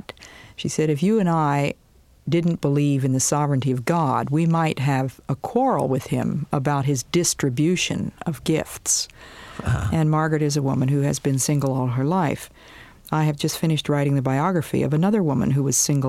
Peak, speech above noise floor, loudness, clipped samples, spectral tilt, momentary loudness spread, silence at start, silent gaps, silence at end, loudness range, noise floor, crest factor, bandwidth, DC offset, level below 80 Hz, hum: -6 dBFS; 21 dB; -22 LUFS; under 0.1%; -5.5 dB/octave; 8 LU; 0.2 s; none; 0 s; 2 LU; -42 dBFS; 16 dB; 15.5 kHz; under 0.1%; -48 dBFS; none